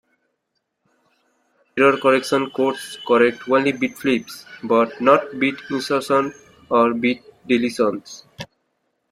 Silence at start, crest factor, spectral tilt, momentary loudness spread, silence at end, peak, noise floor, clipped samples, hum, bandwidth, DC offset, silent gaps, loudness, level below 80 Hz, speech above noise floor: 1.75 s; 20 dB; -5 dB/octave; 16 LU; 0.65 s; -2 dBFS; -75 dBFS; under 0.1%; none; 15 kHz; under 0.1%; none; -19 LUFS; -64 dBFS; 56 dB